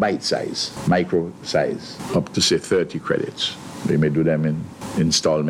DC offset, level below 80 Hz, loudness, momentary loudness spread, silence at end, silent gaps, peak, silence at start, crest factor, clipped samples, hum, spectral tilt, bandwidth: under 0.1%; -50 dBFS; -21 LUFS; 7 LU; 0 s; none; -6 dBFS; 0 s; 16 dB; under 0.1%; none; -4.5 dB/octave; 15 kHz